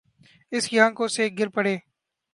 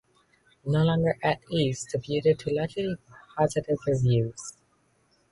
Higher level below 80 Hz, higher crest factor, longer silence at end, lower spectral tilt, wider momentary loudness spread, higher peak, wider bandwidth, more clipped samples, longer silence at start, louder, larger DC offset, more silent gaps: second, -76 dBFS vs -54 dBFS; first, 22 dB vs 16 dB; second, 0.55 s vs 0.8 s; second, -3.5 dB/octave vs -6.5 dB/octave; second, 10 LU vs 14 LU; first, -4 dBFS vs -10 dBFS; about the same, 11.5 kHz vs 11.5 kHz; neither; second, 0.5 s vs 0.65 s; first, -23 LUFS vs -27 LUFS; neither; neither